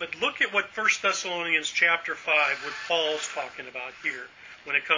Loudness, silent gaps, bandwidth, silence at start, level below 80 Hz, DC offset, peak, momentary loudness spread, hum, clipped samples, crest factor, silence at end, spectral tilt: -25 LUFS; none; 7.6 kHz; 0 s; -72 dBFS; under 0.1%; -8 dBFS; 13 LU; none; under 0.1%; 20 dB; 0 s; -0.5 dB/octave